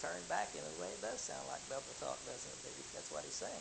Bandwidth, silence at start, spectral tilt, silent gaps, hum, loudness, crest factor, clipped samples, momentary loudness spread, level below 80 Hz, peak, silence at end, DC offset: 13 kHz; 0 s; -1.5 dB/octave; none; none; -44 LUFS; 20 dB; under 0.1%; 6 LU; -70 dBFS; -24 dBFS; 0 s; under 0.1%